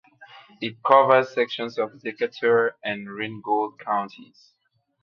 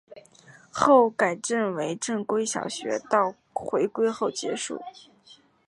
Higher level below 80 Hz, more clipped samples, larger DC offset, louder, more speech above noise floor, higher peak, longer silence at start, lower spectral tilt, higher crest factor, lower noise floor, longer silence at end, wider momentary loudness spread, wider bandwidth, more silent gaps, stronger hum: second, -74 dBFS vs -68 dBFS; neither; neither; about the same, -23 LUFS vs -25 LUFS; second, 26 dB vs 31 dB; about the same, -2 dBFS vs -4 dBFS; about the same, 0.2 s vs 0.1 s; first, -6 dB/octave vs -3.5 dB/octave; about the same, 22 dB vs 22 dB; second, -49 dBFS vs -56 dBFS; first, 0.8 s vs 0.35 s; about the same, 14 LU vs 14 LU; second, 6.8 kHz vs 11.5 kHz; neither; neither